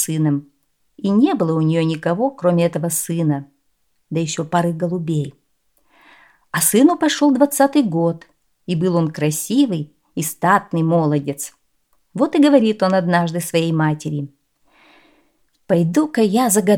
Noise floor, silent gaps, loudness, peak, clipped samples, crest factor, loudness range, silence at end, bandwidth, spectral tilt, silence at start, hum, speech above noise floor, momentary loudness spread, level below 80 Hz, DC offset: -68 dBFS; none; -18 LUFS; 0 dBFS; under 0.1%; 18 dB; 4 LU; 0 s; 19 kHz; -5.5 dB/octave; 0 s; none; 51 dB; 12 LU; -64 dBFS; under 0.1%